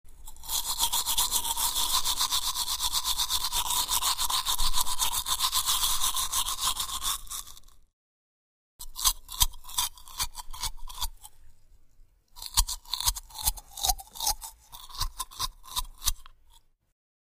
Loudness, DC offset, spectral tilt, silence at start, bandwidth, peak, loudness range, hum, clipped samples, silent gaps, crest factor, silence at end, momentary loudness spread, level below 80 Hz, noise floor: -28 LUFS; under 0.1%; 1 dB/octave; 0.05 s; 16 kHz; -4 dBFS; 7 LU; none; under 0.1%; 7.93-8.79 s; 26 dB; 0.7 s; 11 LU; -40 dBFS; -59 dBFS